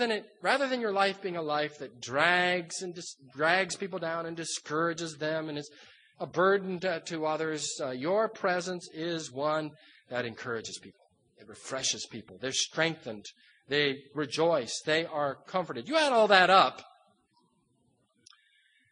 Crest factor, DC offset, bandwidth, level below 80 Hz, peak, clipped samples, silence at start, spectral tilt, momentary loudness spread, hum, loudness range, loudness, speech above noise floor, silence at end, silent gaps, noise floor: 26 dB; under 0.1%; 10 kHz; -78 dBFS; -6 dBFS; under 0.1%; 0 s; -3 dB/octave; 16 LU; none; 8 LU; -29 LUFS; 41 dB; 2.05 s; none; -72 dBFS